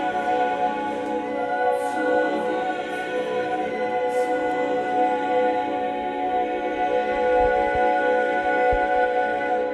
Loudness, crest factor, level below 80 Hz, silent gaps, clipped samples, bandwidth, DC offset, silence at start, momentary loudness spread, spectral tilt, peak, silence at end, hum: -23 LUFS; 14 dB; -46 dBFS; none; under 0.1%; 11.5 kHz; under 0.1%; 0 s; 6 LU; -5 dB/octave; -8 dBFS; 0 s; none